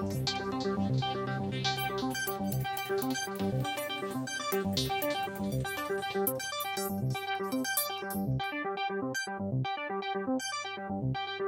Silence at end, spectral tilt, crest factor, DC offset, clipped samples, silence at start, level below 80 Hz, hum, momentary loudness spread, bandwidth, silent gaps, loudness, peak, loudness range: 0 s; -4.5 dB/octave; 16 dB; under 0.1%; under 0.1%; 0 s; -58 dBFS; none; 4 LU; 17 kHz; none; -33 LUFS; -16 dBFS; 1 LU